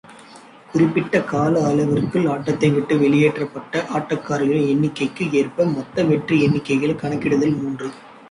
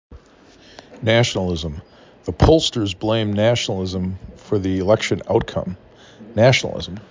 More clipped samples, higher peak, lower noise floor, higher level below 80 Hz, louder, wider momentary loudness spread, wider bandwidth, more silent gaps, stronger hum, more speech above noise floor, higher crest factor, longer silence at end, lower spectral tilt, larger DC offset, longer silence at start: neither; about the same, -4 dBFS vs -2 dBFS; second, -44 dBFS vs -49 dBFS; second, -54 dBFS vs -34 dBFS; about the same, -19 LUFS vs -19 LUFS; second, 7 LU vs 16 LU; first, 11 kHz vs 7.6 kHz; neither; neither; second, 25 dB vs 30 dB; about the same, 14 dB vs 18 dB; about the same, 0.2 s vs 0.1 s; first, -7 dB/octave vs -5.5 dB/octave; neither; about the same, 0.1 s vs 0.1 s